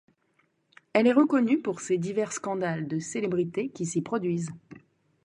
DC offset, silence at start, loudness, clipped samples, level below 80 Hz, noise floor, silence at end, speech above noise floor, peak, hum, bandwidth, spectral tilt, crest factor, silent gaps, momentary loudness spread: under 0.1%; 0.95 s; -27 LUFS; under 0.1%; -72 dBFS; -70 dBFS; 0.45 s; 44 dB; -8 dBFS; none; 11 kHz; -6 dB/octave; 20 dB; none; 9 LU